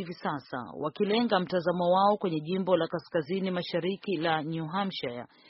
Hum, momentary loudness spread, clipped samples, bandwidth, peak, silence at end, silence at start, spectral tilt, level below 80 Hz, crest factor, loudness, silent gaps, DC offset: none; 10 LU; under 0.1%; 5.8 kHz; -10 dBFS; 0.25 s; 0 s; -4.5 dB/octave; -70 dBFS; 18 dB; -29 LUFS; none; under 0.1%